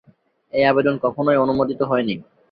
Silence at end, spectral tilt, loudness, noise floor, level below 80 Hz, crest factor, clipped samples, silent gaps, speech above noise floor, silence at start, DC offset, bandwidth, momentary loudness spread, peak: 0.3 s; -9.5 dB/octave; -19 LUFS; -57 dBFS; -56 dBFS; 18 dB; under 0.1%; none; 38 dB; 0.55 s; under 0.1%; 5.2 kHz; 10 LU; -2 dBFS